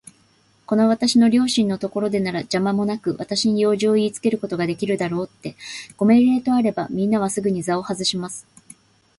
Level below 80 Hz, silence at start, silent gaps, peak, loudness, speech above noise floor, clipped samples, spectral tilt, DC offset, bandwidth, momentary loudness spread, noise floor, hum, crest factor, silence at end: -60 dBFS; 0.7 s; none; -6 dBFS; -20 LUFS; 39 dB; under 0.1%; -5 dB/octave; under 0.1%; 11.5 kHz; 12 LU; -58 dBFS; none; 14 dB; 0.75 s